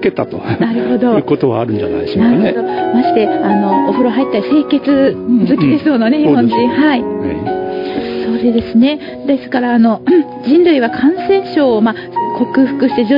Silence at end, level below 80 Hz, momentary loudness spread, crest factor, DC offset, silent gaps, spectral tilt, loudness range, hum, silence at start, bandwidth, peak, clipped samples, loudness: 0 s; -48 dBFS; 8 LU; 12 dB; under 0.1%; none; -9.5 dB/octave; 2 LU; none; 0 s; 5.4 kHz; 0 dBFS; under 0.1%; -13 LUFS